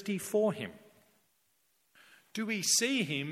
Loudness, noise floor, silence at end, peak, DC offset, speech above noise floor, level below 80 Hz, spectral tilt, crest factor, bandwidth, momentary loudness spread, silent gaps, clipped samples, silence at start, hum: -31 LUFS; -74 dBFS; 0 s; -14 dBFS; under 0.1%; 42 dB; -80 dBFS; -2.5 dB/octave; 20 dB; 16.5 kHz; 15 LU; none; under 0.1%; 0 s; none